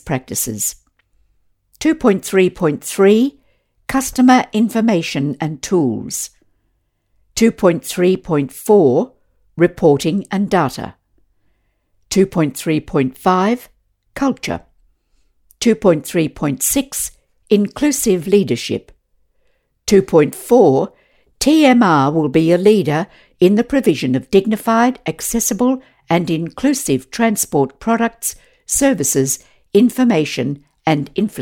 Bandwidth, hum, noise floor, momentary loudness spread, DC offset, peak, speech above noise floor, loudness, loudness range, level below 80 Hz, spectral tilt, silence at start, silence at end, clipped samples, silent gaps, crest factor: 17.5 kHz; none; -65 dBFS; 11 LU; under 0.1%; 0 dBFS; 50 dB; -16 LUFS; 5 LU; -46 dBFS; -5 dB/octave; 0.05 s; 0 s; under 0.1%; none; 16 dB